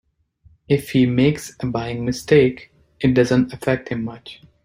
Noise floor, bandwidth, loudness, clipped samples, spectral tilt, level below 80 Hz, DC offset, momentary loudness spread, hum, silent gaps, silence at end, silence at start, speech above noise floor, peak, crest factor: -55 dBFS; 16 kHz; -19 LUFS; under 0.1%; -6.5 dB/octave; -48 dBFS; under 0.1%; 13 LU; none; none; 0.3 s; 0.7 s; 37 dB; -2 dBFS; 18 dB